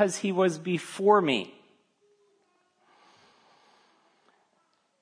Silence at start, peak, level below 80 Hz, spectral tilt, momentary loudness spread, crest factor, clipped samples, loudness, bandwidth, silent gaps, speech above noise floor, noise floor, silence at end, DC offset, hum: 0 s; -8 dBFS; -86 dBFS; -5 dB/octave; 10 LU; 22 dB; under 0.1%; -26 LUFS; 11 kHz; none; 46 dB; -71 dBFS; 3.5 s; under 0.1%; none